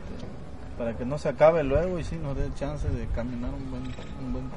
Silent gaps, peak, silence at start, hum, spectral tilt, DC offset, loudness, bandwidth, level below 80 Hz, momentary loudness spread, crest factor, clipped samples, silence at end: none; -6 dBFS; 0 s; none; -7.5 dB/octave; 1%; -28 LUFS; 10.5 kHz; -36 dBFS; 19 LU; 22 dB; under 0.1%; 0 s